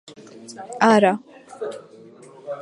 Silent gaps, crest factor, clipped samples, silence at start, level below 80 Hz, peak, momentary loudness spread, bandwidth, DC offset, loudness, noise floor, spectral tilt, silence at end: none; 22 dB; under 0.1%; 0.35 s; -74 dBFS; -2 dBFS; 25 LU; 11 kHz; under 0.1%; -18 LUFS; -45 dBFS; -5.5 dB/octave; 0 s